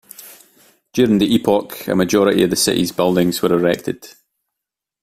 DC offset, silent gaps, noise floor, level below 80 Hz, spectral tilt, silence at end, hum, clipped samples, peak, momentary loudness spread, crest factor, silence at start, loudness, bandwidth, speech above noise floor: under 0.1%; none; -83 dBFS; -50 dBFS; -4.5 dB/octave; 0.9 s; none; under 0.1%; -2 dBFS; 12 LU; 16 dB; 0.2 s; -16 LUFS; 16 kHz; 67 dB